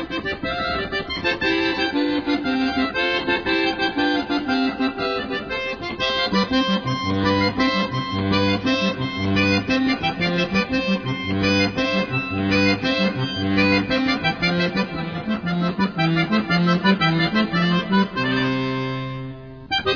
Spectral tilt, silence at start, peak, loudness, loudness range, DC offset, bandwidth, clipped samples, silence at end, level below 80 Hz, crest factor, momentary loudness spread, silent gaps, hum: -6 dB/octave; 0 s; -4 dBFS; -21 LUFS; 2 LU; under 0.1%; 5.4 kHz; under 0.1%; 0 s; -46 dBFS; 16 dB; 7 LU; none; none